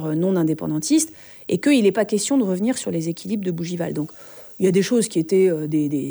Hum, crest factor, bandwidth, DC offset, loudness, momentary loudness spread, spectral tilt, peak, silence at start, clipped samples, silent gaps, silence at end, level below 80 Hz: none; 16 dB; over 20 kHz; under 0.1%; -21 LUFS; 9 LU; -5.5 dB/octave; -6 dBFS; 0 s; under 0.1%; none; 0 s; -66 dBFS